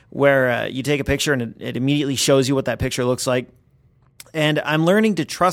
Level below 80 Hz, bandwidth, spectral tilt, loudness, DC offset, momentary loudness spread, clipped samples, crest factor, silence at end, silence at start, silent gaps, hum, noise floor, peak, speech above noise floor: -44 dBFS; 16.5 kHz; -4.5 dB/octave; -19 LUFS; under 0.1%; 7 LU; under 0.1%; 18 dB; 0 s; 0.15 s; none; none; -56 dBFS; -2 dBFS; 37 dB